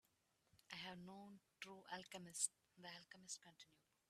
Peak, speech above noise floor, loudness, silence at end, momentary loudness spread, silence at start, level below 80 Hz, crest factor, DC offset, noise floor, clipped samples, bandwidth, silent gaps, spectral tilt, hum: -26 dBFS; 29 dB; -52 LUFS; 0.35 s; 19 LU; 0.55 s; under -90 dBFS; 30 dB; under 0.1%; -84 dBFS; under 0.1%; 14 kHz; none; -1.5 dB/octave; none